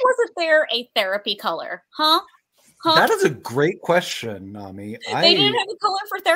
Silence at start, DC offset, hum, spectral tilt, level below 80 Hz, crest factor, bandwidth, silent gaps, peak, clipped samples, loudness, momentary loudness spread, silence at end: 0 s; under 0.1%; none; -3.5 dB/octave; -70 dBFS; 20 dB; 16 kHz; none; 0 dBFS; under 0.1%; -19 LUFS; 16 LU; 0 s